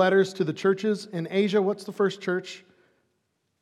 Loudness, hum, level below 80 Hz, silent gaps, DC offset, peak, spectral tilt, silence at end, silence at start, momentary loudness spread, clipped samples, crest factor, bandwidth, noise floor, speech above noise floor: -26 LUFS; none; -86 dBFS; none; under 0.1%; -8 dBFS; -6 dB/octave; 1.05 s; 0 s; 8 LU; under 0.1%; 18 dB; 12 kHz; -75 dBFS; 50 dB